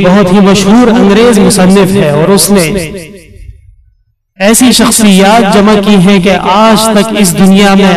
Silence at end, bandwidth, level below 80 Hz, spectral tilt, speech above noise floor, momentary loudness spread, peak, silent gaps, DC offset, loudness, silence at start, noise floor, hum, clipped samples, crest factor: 0 s; 16 kHz; -32 dBFS; -4.5 dB/octave; 46 dB; 4 LU; 0 dBFS; none; under 0.1%; -4 LUFS; 0 s; -50 dBFS; none; 2%; 4 dB